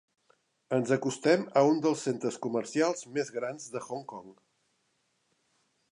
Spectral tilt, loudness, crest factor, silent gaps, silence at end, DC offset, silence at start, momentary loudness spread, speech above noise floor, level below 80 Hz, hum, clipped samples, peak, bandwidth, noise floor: -5 dB/octave; -30 LUFS; 20 dB; none; 1.65 s; under 0.1%; 0.7 s; 14 LU; 46 dB; -82 dBFS; none; under 0.1%; -10 dBFS; 11 kHz; -75 dBFS